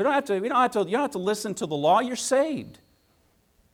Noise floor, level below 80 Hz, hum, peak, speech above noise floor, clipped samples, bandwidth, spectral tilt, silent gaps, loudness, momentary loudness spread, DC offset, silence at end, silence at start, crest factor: -65 dBFS; -68 dBFS; none; -10 dBFS; 40 dB; under 0.1%; 17 kHz; -4 dB/octave; none; -25 LUFS; 7 LU; under 0.1%; 1 s; 0 s; 16 dB